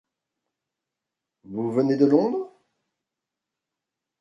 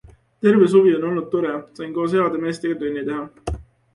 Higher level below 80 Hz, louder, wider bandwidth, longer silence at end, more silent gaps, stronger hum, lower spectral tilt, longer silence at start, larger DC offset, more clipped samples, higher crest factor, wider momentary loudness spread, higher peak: second, -74 dBFS vs -42 dBFS; about the same, -22 LUFS vs -20 LUFS; second, 7.6 kHz vs 11 kHz; first, 1.75 s vs 0.35 s; neither; neither; first, -9 dB/octave vs -7.5 dB/octave; first, 1.5 s vs 0.4 s; neither; neither; about the same, 22 dB vs 18 dB; about the same, 16 LU vs 16 LU; second, -6 dBFS vs -2 dBFS